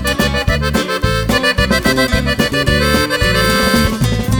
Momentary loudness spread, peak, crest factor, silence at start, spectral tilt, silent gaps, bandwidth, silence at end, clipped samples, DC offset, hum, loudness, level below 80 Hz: 4 LU; 0 dBFS; 14 dB; 0 s; -4.5 dB/octave; none; over 20 kHz; 0 s; under 0.1%; under 0.1%; none; -13 LUFS; -22 dBFS